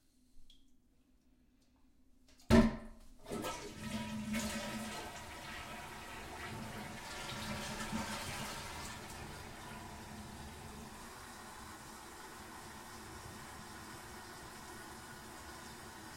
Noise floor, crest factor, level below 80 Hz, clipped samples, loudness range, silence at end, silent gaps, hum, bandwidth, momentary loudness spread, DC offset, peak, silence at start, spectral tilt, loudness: -69 dBFS; 30 dB; -54 dBFS; under 0.1%; 13 LU; 0 s; none; none; 16.5 kHz; 11 LU; under 0.1%; -12 dBFS; 0.35 s; -4.5 dB/octave; -42 LUFS